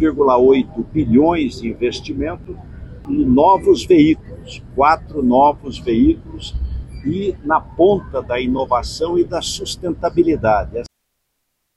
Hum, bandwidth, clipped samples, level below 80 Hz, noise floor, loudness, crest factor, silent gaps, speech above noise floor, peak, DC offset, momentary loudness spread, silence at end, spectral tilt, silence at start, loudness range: none; 12 kHz; under 0.1%; -34 dBFS; -71 dBFS; -16 LUFS; 14 dB; none; 56 dB; -2 dBFS; under 0.1%; 15 LU; 0.9 s; -6 dB/octave; 0 s; 4 LU